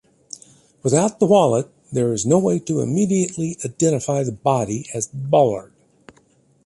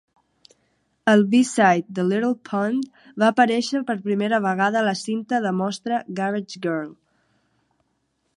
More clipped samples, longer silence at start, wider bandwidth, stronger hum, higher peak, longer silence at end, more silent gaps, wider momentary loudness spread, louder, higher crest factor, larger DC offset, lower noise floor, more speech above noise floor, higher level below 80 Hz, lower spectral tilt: neither; second, 0.85 s vs 1.05 s; about the same, 11.5 kHz vs 11.5 kHz; neither; about the same, -2 dBFS vs -2 dBFS; second, 1 s vs 1.45 s; neither; about the same, 11 LU vs 10 LU; about the same, -19 LUFS vs -21 LUFS; about the same, 18 dB vs 20 dB; neither; second, -57 dBFS vs -71 dBFS; second, 39 dB vs 50 dB; first, -56 dBFS vs -72 dBFS; about the same, -6 dB/octave vs -5.5 dB/octave